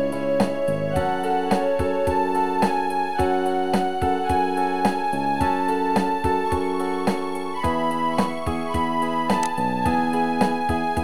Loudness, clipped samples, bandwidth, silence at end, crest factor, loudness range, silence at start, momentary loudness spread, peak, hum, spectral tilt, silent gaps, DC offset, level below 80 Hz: -23 LUFS; under 0.1%; over 20 kHz; 0 s; 16 dB; 2 LU; 0 s; 3 LU; -6 dBFS; none; -6 dB/octave; none; 2%; -42 dBFS